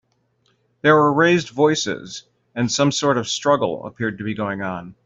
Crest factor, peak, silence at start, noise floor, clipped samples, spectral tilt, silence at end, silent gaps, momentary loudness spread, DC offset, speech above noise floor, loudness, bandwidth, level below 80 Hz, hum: 18 dB; -2 dBFS; 0.85 s; -65 dBFS; under 0.1%; -4.5 dB/octave; 0.15 s; none; 13 LU; under 0.1%; 46 dB; -19 LUFS; 8 kHz; -60 dBFS; none